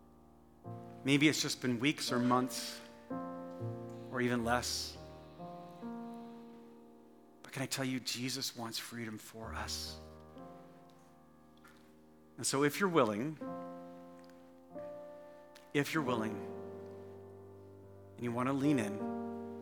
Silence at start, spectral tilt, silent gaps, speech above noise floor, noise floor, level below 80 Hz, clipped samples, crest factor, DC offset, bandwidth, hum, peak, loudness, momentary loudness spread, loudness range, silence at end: 0 s; -4 dB/octave; none; 27 dB; -62 dBFS; -66 dBFS; under 0.1%; 24 dB; under 0.1%; 19 kHz; none; -14 dBFS; -36 LUFS; 23 LU; 9 LU; 0 s